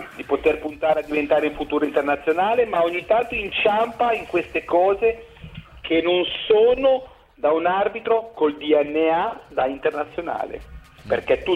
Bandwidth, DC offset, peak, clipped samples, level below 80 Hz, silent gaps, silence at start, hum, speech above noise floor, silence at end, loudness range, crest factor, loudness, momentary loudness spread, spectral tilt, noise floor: 10 kHz; under 0.1%; -8 dBFS; under 0.1%; -48 dBFS; none; 0 s; none; 20 dB; 0 s; 2 LU; 14 dB; -21 LUFS; 9 LU; -6 dB/octave; -40 dBFS